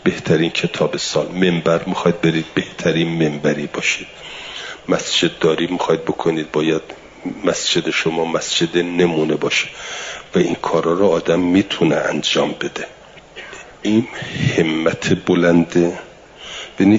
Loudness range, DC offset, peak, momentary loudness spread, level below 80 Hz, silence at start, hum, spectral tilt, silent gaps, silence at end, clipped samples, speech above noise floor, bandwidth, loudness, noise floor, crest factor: 2 LU; under 0.1%; -2 dBFS; 14 LU; -52 dBFS; 0 s; none; -5 dB/octave; none; 0 s; under 0.1%; 20 dB; 7.8 kHz; -18 LUFS; -38 dBFS; 16 dB